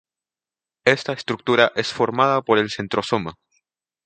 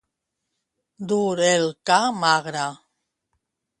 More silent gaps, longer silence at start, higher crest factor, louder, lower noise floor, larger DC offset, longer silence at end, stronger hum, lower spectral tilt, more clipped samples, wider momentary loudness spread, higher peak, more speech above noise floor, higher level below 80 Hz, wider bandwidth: neither; second, 0.85 s vs 1 s; about the same, 22 dB vs 20 dB; about the same, -20 LUFS vs -21 LUFS; first, under -90 dBFS vs -80 dBFS; neither; second, 0.75 s vs 1.05 s; neither; first, -5 dB/octave vs -3.5 dB/octave; neither; about the same, 8 LU vs 10 LU; first, 0 dBFS vs -4 dBFS; first, over 70 dB vs 59 dB; first, -60 dBFS vs -72 dBFS; second, 9.2 kHz vs 11.5 kHz